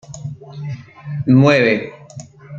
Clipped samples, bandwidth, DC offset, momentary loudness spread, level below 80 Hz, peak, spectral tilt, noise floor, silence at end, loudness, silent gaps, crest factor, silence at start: under 0.1%; 7.6 kHz; under 0.1%; 24 LU; -56 dBFS; -2 dBFS; -7 dB/octave; -37 dBFS; 0 s; -14 LUFS; none; 16 dB; 0.1 s